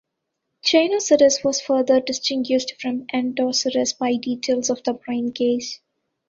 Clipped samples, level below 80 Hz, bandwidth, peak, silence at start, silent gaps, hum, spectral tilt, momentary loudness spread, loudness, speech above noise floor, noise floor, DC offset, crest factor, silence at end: under 0.1%; -64 dBFS; 7.8 kHz; -4 dBFS; 0.65 s; none; none; -2.5 dB/octave; 9 LU; -20 LUFS; 58 dB; -78 dBFS; under 0.1%; 18 dB; 0.55 s